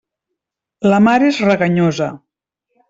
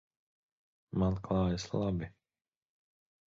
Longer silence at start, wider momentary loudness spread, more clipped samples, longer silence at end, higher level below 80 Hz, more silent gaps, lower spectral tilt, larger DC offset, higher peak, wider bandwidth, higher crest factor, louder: second, 0.8 s vs 0.95 s; about the same, 9 LU vs 8 LU; neither; second, 0.75 s vs 1.15 s; second, -56 dBFS vs -50 dBFS; neither; about the same, -6.5 dB/octave vs -7.5 dB/octave; neither; first, -2 dBFS vs -20 dBFS; about the same, 7.8 kHz vs 7.6 kHz; about the same, 14 dB vs 16 dB; first, -14 LUFS vs -34 LUFS